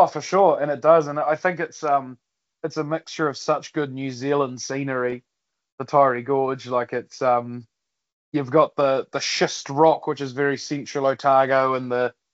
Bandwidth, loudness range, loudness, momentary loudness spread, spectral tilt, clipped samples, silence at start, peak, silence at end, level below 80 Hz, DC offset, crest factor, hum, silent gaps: 8 kHz; 5 LU; -22 LUFS; 10 LU; -4 dB/octave; under 0.1%; 0 s; -4 dBFS; 0.25 s; -72 dBFS; under 0.1%; 20 dB; none; 5.72-5.78 s, 8.13-8.32 s